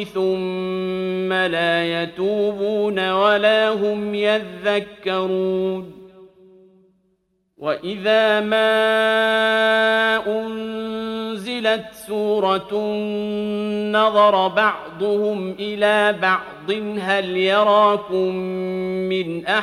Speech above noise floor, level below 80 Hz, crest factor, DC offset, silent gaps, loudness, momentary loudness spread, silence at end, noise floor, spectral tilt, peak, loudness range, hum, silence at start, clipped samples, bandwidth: 48 dB; -62 dBFS; 16 dB; under 0.1%; none; -19 LUFS; 10 LU; 0 s; -67 dBFS; -5 dB/octave; -2 dBFS; 6 LU; none; 0 s; under 0.1%; 13.5 kHz